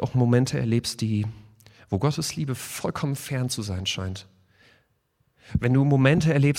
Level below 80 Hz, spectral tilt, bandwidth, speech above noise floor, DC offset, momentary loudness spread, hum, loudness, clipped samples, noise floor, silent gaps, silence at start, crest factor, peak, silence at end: -48 dBFS; -6 dB/octave; 16 kHz; 46 dB; under 0.1%; 12 LU; none; -25 LUFS; under 0.1%; -69 dBFS; none; 0 s; 20 dB; -4 dBFS; 0 s